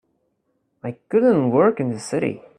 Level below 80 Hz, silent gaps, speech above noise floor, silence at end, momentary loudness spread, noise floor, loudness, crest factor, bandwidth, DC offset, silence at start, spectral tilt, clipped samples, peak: -64 dBFS; none; 51 dB; 0.2 s; 17 LU; -70 dBFS; -19 LUFS; 18 dB; 10.5 kHz; under 0.1%; 0.85 s; -7 dB/octave; under 0.1%; -4 dBFS